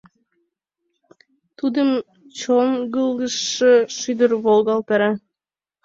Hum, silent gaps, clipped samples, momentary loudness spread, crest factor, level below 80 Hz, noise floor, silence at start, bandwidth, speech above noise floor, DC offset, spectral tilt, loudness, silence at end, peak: none; none; under 0.1%; 10 LU; 16 dB; -66 dBFS; under -90 dBFS; 1.65 s; 7.8 kHz; over 72 dB; under 0.1%; -3.5 dB/octave; -19 LUFS; 0.65 s; -4 dBFS